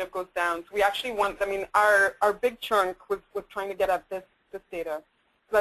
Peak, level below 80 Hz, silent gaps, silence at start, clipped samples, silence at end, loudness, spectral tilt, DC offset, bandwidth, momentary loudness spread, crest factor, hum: -8 dBFS; -58 dBFS; none; 0 s; under 0.1%; 0 s; -26 LUFS; -2.5 dB/octave; under 0.1%; 13.5 kHz; 17 LU; 20 dB; none